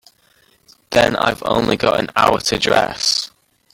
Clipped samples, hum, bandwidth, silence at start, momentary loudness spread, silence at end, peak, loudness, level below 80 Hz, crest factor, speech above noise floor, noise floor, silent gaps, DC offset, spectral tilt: under 0.1%; none; 17 kHz; 0.9 s; 4 LU; 0.45 s; 0 dBFS; -16 LUFS; -44 dBFS; 18 dB; 40 dB; -56 dBFS; none; under 0.1%; -3 dB/octave